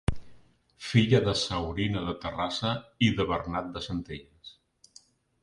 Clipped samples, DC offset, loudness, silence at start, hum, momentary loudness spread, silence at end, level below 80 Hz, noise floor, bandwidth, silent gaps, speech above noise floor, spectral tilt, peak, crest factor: under 0.1%; under 0.1%; -28 LUFS; 0.1 s; none; 19 LU; 0.9 s; -46 dBFS; -59 dBFS; 11.5 kHz; none; 31 dB; -6 dB/octave; -8 dBFS; 22 dB